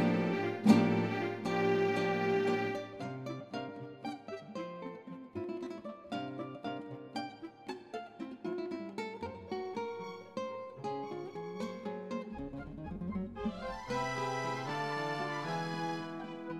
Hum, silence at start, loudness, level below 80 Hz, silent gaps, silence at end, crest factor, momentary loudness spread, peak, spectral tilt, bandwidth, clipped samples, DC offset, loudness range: none; 0 s; -37 LUFS; -64 dBFS; none; 0 s; 24 dB; 13 LU; -12 dBFS; -6.5 dB/octave; 13.5 kHz; under 0.1%; under 0.1%; 11 LU